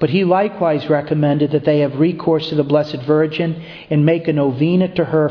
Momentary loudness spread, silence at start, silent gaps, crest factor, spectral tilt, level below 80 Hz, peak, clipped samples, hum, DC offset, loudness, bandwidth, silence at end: 3 LU; 0 s; none; 14 dB; -9.5 dB/octave; -54 dBFS; 0 dBFS; under 0.1%; none; under 0.1%; -16 LUFS; 5.4 kHz; 0 s